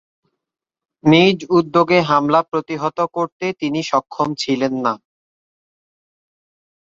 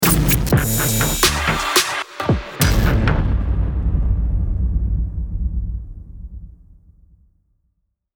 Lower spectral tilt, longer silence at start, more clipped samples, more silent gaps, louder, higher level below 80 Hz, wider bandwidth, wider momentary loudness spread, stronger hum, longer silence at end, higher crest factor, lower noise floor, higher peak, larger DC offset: first, -6 dB/octave vs -4 dB/octave; first, 1.05 s vs 0 s; neither; first, 3.32-3.40 s vs none; about the same, -17 LUFS vs -19 LUFS; second, -60 dBFS vs -22 dBFS; second, 7.8 kHz vs over 20 kHz; second, 10 LU vs 16 LU; neither; first, 1.85 s vs 1.65 s; about the same, 18 dB vs 18 dB; first, -85 dBFS vs -69 dBFS; about the same, -2 dBFS vs -2 dBFS; neither